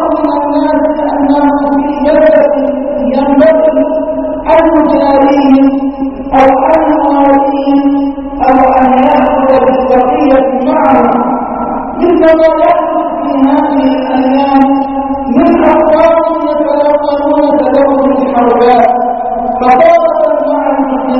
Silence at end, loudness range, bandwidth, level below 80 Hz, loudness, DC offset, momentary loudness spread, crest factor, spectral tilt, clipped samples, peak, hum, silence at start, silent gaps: 0 s; 1 LU; 6 kHz; -34 dBFS; -8 LUFS; 0.8%; 7 LU; 8 dB; -7.5 dB/octave; 0.6%; 0 dBFS; none; 0 s; none